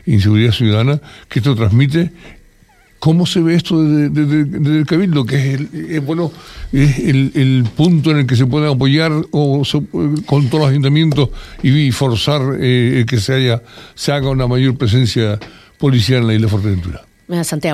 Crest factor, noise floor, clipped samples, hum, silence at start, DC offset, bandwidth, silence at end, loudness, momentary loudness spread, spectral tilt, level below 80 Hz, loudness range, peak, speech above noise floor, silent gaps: 12 dB; -48 dBFS; under 0.1%; none; 0.05 s; under 0.1%; 14 kHz; 0 s; -14 LUFS; 8 LU; -6.5 dB/octave; -36 dBFS; 2 LU; 0 dBFS; 35 dB; none